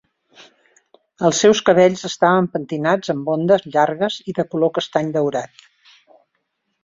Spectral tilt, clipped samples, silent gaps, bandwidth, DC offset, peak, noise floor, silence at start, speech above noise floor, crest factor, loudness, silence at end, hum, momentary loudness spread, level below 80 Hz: -4.5 dB/octave; under 0.1%; none; 7.8 kHz; under 0.1%; -2 dBFS; -72 dBFS; 1.2 s; 55 dB; 18 dB; -18 LUFS; 1.4 s; none; 9 LU; -62 dBFS